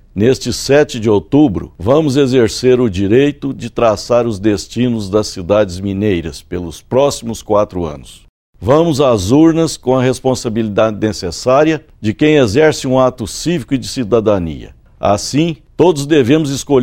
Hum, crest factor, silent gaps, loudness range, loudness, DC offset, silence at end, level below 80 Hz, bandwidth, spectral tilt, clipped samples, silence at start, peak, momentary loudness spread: none; 14 dB; 8.29-8.53 s; 4 LU; -13 LUFS; under 0.1%; 0 s; -38 dBFS; 16 kHz; -6 dB/octave; under 0.1%; 0.15 s; 0 dBFS; 9 LU